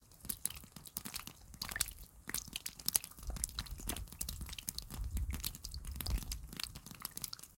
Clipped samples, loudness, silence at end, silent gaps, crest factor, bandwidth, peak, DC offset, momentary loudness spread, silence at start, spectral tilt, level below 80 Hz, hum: under 0.1%; -42 LUFS; 0 s; none; 36 dB; 17 kHz; -8 dBFS; under 0.1%; 9 LU; 0 s; -2 dB/octave; -48 dBFS; none